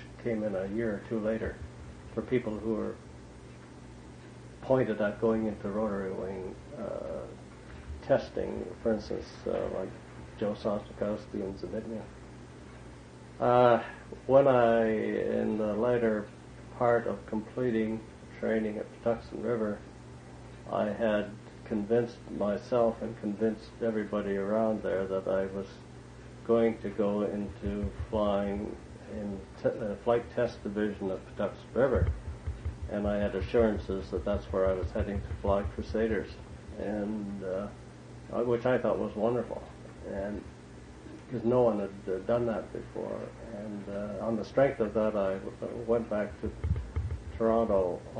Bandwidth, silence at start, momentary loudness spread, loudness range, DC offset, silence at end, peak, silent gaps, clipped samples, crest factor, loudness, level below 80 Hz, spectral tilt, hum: 10 kHz; 0 s; 20 LU; 7 LU; under 0.1%; 0 s; -10 dBFS; none; under 0.1%; 22 dB; -31 LUFS; -48 dBFS; -8 dB/octave; 60 Hz at -60 dBFS